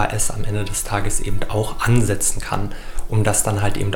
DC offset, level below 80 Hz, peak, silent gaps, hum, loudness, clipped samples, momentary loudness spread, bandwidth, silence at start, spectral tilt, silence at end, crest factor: under 0.1%; -28 dBFS; -2 dBFS; none; none; -21 LUFS; under 0.1%; 8 LU; 17 kHz; 0 s; -4.5 dB/octave; 0 s; 16 dB